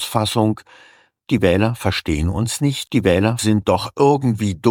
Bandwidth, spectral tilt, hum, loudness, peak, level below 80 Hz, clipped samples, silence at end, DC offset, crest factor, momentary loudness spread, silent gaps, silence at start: 17.5 kHz; -5.5 dB/octave; none; -18 LUFS; 0 dBFS; -38 dBFS; under 0.1%; 0 s; under 0.1%; 18 dB; 5 LU; none; 0 s